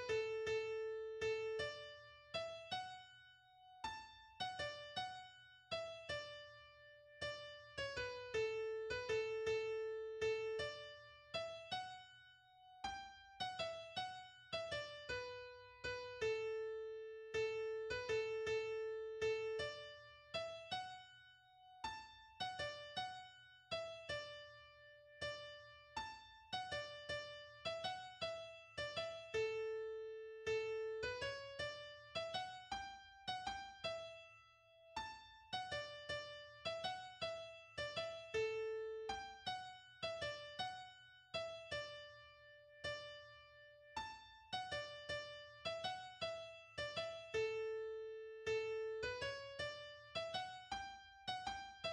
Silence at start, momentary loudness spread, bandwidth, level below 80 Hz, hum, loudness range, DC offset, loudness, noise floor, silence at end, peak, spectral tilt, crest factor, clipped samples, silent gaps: 0 s; 16 LU; 10.5 kHz; -72 dBFS; none; 6 LU; under 0.1%; -46 LUFS; -68 dBFS; 0 s; -30 dBFS; -3 dB/octave; 16 dB; under 0.1%; none